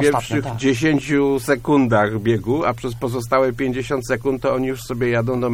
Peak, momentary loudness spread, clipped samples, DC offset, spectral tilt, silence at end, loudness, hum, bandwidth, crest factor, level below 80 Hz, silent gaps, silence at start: -4 dBFS; 6 LU; under 0.1%; under 0.1%; -6 dB/octave; 0 s; -19 LUFS; none; 16.5 kHz; 16 dB; -42 dBFS; none; 0 s